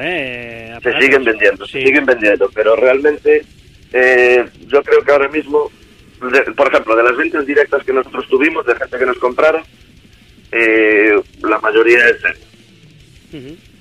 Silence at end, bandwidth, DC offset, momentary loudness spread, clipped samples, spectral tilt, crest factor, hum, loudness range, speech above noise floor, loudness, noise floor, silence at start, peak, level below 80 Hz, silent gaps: 0.25 s; 11.5 kHz; 0.1%; 10 LU; under 0.1%; -4.5 dB/octave; 14 dB; none; 2 LU; 31 dB; -12 LUFS; -44 dBFS; 0 s; 0 dBFS; -48 dBFS; none